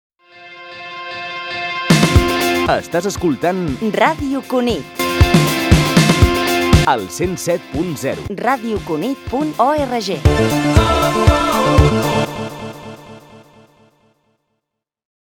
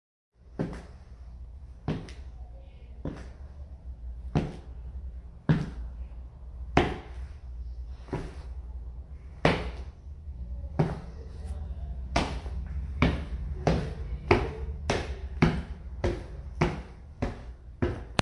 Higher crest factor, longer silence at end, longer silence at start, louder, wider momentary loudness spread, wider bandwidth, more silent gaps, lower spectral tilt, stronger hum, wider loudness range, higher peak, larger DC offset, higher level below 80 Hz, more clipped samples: second, 16 dB vs 30 dB; first, 1.95 s vs 0 s; about the same, 0.35 s vs 0.4 s; first, -16 LUFS vs -33 LUFS; second, 13 LU vs 18 LU; first, 19.5 kHz vs 11.5 kHz; neither; about the same, -5.5 dB/octave vs -6.5 dB/octave; neither; second, 5 LU vs 9 LU; about the same, 0 dBFS vs -2 dBFS; neither; first, -26 dBFS vs -38 dBFS; neither